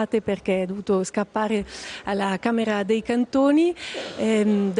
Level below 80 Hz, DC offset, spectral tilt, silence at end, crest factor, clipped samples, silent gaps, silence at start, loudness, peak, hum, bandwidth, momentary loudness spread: -56 dBFS; under 0.1%; -5.5 dB/octave; 0 s; 14 dB; under 0.1%; none; 0 s; -23 LUFS; -8 dBFS; none; 10.5 kHz; 8 LU